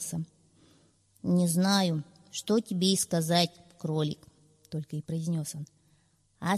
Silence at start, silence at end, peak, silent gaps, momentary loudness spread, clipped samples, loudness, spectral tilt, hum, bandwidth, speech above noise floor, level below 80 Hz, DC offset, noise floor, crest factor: 0 s; 0 s; -12 dBFS; none; 14 LU; under 0.1%; -29 LUFS; -5 dB/octave; none; 14.5 kHz; 39 dB; -68 dBFS; under 0.1%; -67 dBFS; 18 dB